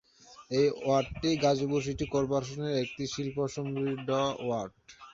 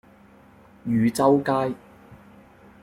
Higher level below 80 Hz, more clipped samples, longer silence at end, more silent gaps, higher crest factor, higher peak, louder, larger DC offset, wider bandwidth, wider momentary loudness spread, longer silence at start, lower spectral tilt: about the same, -56 dBFS vs -60 dBFS; neither; second, 0 s vs 0.7 s; neither; about the same, 18 dB vs 20 dB; second, -14 dBFS vs -6 dBFS; second, -31 LUFS vs -22 LUFS; neither; second, 7.8 kHz vs 16 kHz; second, 7 LU vs 16 LU; second, 0.25 s vs 0.85 s; about the same, -5.5 dB/octave vs -6.5 dB/octave